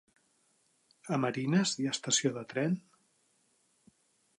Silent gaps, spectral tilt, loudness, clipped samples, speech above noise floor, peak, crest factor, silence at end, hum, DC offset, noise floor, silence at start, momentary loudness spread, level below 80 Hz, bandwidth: none; -4 dB/octave; -31 LUFS; under 0.1%; 41 dB; -16 dBFS; 20 dB; 1.6 s; none; under 0.1%; -73 dBFS; 1.05 s; 7 LU; -80 dBFS; 11.5 kHz